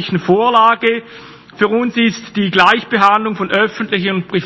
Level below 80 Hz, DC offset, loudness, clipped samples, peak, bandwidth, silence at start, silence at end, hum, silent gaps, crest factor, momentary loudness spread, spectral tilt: -56 dBFS; under 0.1%; -13 LUFS; 0.3%; 0 dBFS; 8 kHz; 0 s; 0 s; none; none; 14 dB; 7 LU; -5.5 dB/octave